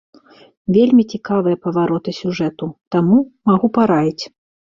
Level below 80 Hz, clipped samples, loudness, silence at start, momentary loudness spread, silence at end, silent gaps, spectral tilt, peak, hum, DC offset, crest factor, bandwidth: -56 dBFS; under 0.1%; -16 LUFS; 0.7 s; 10 LU; 0.5 s; 2.87-2.91 s; -8 dB/octave; -2 dBFS; none; under 0.1%; 14 dB; 7.4 kHz